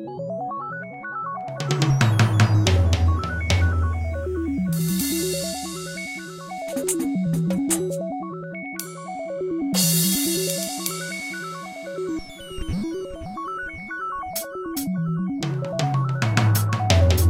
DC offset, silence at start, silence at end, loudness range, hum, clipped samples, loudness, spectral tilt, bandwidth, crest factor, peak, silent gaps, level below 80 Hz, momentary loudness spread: under 0.1%; 0 s; 0 s; 9 LU; none; under 0.1%; -24 LUFS; -5 dB/octave; 16 kHz; 20 dB; -2 dBFS; none; -36 dBFS; 14 LU